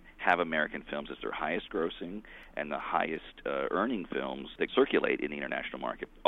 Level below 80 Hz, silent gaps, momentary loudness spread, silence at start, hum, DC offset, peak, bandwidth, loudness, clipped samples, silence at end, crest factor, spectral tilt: -58 dBFS; none; 12 LU; 0 s; none; under 0.1%; -10 dBFS; 5.4 kHz; -33 LUFS; under 0.1%; 0.05 s; 22 dB; -6.5 dB/octave